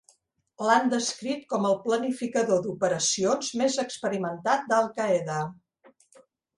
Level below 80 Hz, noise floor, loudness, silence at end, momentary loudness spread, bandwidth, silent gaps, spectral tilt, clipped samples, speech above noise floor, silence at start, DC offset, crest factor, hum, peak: -72 dBFS; -66 dBFS; -26 LUFS; 1.05 s; 7 LU; 11.5 kHz; none; -3.5 dB/octave; under 0.1%; 40 dB; 0.6 s; under 0.1%; 20 dB; none; -8 dBFS